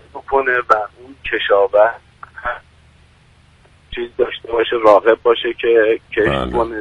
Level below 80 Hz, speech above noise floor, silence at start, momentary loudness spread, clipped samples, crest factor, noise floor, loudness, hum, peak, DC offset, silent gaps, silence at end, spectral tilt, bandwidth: -42 dBFS; 34 dB; 0.15 s; 16 LU; under 0.1%; 16 dB; -50 dBFS; -16 LUFS; none; 0 dBFS; under 0.1%; none; 0 s; -6 dB/octave; 9.8 kHz